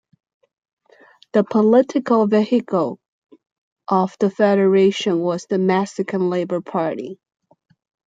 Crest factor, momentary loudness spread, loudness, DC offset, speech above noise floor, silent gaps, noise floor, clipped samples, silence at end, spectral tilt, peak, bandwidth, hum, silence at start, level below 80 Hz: 16 dB; 10 LU; -18 LUFS; under 0.1%; 34 dB; 3.08-3.22 s, 3.52-3.76 s; -51 dBFS; under 0.1%; 0.95 s; -7 dB/octave; -2 dBFS; 7.8 kHz; none; 1.35 s; -68 dBFS